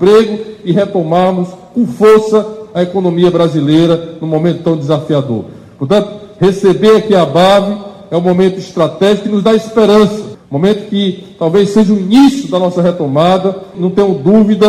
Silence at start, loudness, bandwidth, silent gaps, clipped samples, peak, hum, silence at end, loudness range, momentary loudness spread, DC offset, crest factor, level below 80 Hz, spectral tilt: 0 s; -11 LUFS; 14 kHz; none; under 0.1%; 0 dBFS; none; 0 s; 2 LU; 10 LU; under 0.1%; 10 dB; -46 dBFS; -7 dB/octave